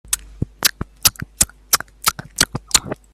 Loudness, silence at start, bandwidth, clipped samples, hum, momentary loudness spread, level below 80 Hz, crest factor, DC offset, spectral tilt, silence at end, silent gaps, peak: -18 LUFS; 0.1 s; over 20 kHz; under 0.1%; none; 5 LU; -40 dBFS; 22 dB; under 0.1%; -1 dB/octave; 0.2 s; none; 0 dBFS